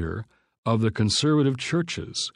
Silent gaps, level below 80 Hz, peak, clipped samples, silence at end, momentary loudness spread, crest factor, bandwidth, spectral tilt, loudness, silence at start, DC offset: 0.58-0.63 s; -50 dBFS; -8 dBFS; under 0.1%; 0.05 s; 12 LU; 16 dB; 11.5 kHz; -5 dB/octave; -24 LUFS; 0 s; under 0.1%